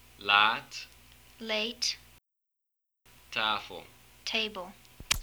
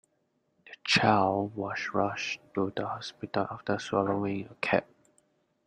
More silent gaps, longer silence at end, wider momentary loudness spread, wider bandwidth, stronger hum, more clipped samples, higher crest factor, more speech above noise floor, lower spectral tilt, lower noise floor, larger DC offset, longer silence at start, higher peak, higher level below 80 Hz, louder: neither; second, 0 s vs 0.85 s; first, 22 LU vs 10 LU; first, over 20 kHz vs 10 kHz; neither; neither; about the same, 26 dB vs 24 dB; first, 53 dB vs 45 dB; second, -1 dB/octave vs -5 dB/octave; first, -84 dBFS vs -75 dBFS; neither; second, 0.2 s vs 0.65 s; about the same, -8 dBFS vs -8 dBFS; first, -56 dBFS vs -68 dBFS; about the same, -29 LUFS vs -30 LUFS